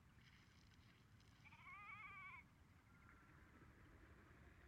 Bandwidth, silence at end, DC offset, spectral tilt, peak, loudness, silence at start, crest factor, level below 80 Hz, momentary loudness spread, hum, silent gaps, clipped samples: 9.4 kHz; 0 s; under 0.1%; -5 dB/octave; -48 dBFS; -63 LUFS; 0 s; 16 dB; -76 dBFS; 12 LU; none; none; under 0.1%